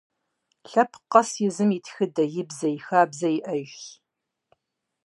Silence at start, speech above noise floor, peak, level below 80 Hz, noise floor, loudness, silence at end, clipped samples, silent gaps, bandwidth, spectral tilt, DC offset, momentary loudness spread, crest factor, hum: 0.7 s; 54 dB; -2 dBFS; -82 dBFS; -78 dBFS; -24 LUFS; 1.15 s; under 0.1%; none; 11.5 kHz; -5.5 dB/octave; under 0.1%; 11 LU; 24 dB; none